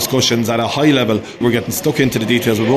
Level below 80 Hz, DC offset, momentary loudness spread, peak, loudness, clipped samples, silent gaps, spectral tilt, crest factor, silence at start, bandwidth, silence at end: -46 dBFS; under 0.1%; 4 LU; -2 dBFS; -15 LUFS; under 0.1%; none; -4.5 dB/octave; 14 dB; 0 s; 14 kHz; 0 s